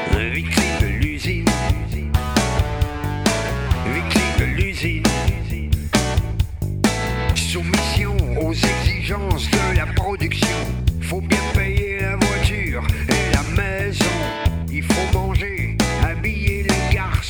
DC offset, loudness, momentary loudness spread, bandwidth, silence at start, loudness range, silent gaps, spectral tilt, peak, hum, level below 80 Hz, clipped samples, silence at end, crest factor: under 0.1%; -20 LUFS; 4 LU; over 20 kHz; 0 s; 1 LU; none; -5 dB/octave; -4 dBFS; none; -26 dBFS; under 0.1%; 0 s; 14 dB